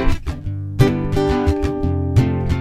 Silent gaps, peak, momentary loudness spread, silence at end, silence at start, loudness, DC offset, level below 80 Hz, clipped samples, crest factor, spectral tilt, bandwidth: none; 0 dBFS; 9 LU; 0 s; 0 s; -19 LUFS; under 0.1%; -24 dBFS; under 0.1%; 16 dB; -8 dB/octave; 14.5 kHz